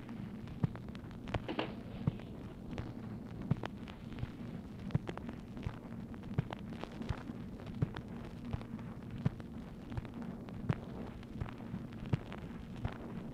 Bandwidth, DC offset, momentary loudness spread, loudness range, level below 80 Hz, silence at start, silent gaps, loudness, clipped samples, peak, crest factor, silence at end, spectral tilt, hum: 15 kHz; under 0.1%; 7 LU; 1 LU; -54 dBFS; 0 s; none; -43 LUFS; under 0.1%; -18 dBFS; 24 dB; 0 s; -8 dB/octave; none